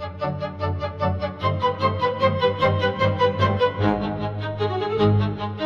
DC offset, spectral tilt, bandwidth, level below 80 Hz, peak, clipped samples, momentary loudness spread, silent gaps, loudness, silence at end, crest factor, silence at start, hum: under 0.1%; -8 dB/octave; 6.8 kHz; -48 dBFS; -6 dBFS; under 0.1%; 7 LU; none; -23 LUFS; 0 s; 16 dB; 0 s; 50 Hz at -40 dBFS